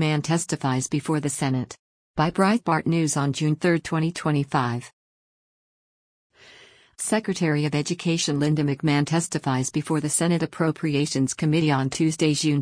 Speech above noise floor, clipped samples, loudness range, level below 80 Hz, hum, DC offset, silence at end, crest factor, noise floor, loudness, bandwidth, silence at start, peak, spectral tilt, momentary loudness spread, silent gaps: 29 dB; under 0.1%; 6 LU; -58 dBFS; none; under 0.1%; 0 s; 16 dB; -52 dBFS; -23 LUFS; 10.5 kHz; 0 s; -8 dBFS; -5 dB/octave; 4 LU; 1.79-2.14 s, 4.93-6.30 s